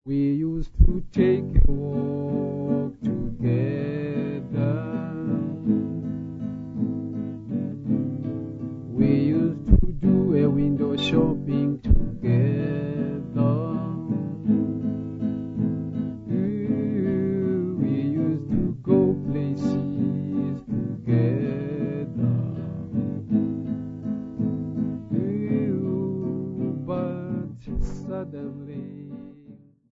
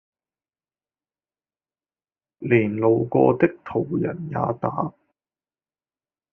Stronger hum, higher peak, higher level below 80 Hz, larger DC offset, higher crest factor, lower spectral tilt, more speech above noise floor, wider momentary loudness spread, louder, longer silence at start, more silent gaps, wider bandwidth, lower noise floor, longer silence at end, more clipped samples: neither; about the same, -2 dBFS vs -4 dBFS; first, -32 dBFS vs -62 dBFS; neither; about the same, 22 dB vs 22 dB; first, -9.5 dB/octave vs -8 dB/octave; second, 30 dB vs over 69 dB; about the same, 10 LU vs 10 LU; second, -25 LUFS vs -22 LUFS; second, 0.05 s vs 2.4 s; neither; first, 7.6 kHz vs 3.4 kHz; second, -49 dBFS vs under -90 dBFS; second, 0.35 s vs 1.4 s; neither